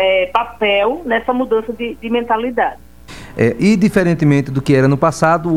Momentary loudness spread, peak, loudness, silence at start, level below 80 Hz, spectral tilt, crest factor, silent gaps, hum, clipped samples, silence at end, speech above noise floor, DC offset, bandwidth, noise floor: 7 LU; 0 dBFS; -15 LUFS; 0 s; -42 dBFS; -6.5 dB/octave; 14 dB; none; none; under 0.1%; 0 s; 21 dB; 0.8%; 15 kHz; -36 dBFS